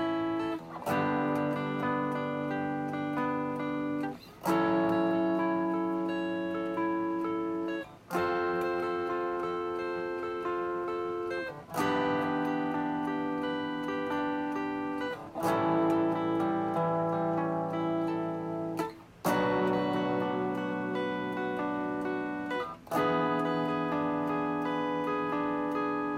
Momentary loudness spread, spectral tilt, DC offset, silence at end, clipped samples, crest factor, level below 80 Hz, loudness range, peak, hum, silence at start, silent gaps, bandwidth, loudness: 6 LU; -6.5 dB/octave; under 0.1%; 0 s; under 0.1%; 14 dB; -66 dBFS; 3 LU; -16 dBFS; none; 0 s; none; 16 kHz; -31 LUFS